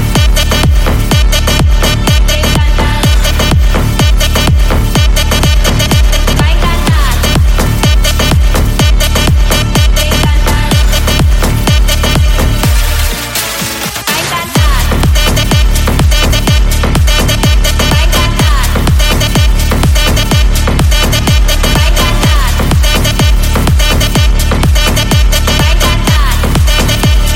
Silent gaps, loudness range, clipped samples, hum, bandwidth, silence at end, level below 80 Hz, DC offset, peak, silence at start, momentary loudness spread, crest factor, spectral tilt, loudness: none; 1 LU; under 0.1%; none; 17 kHz; 0 s; -10 dBFS; under 0.1%; 0 dBFS; 0 s; 2 LU; 8 dB; -4 dB/octave; -9 LUFS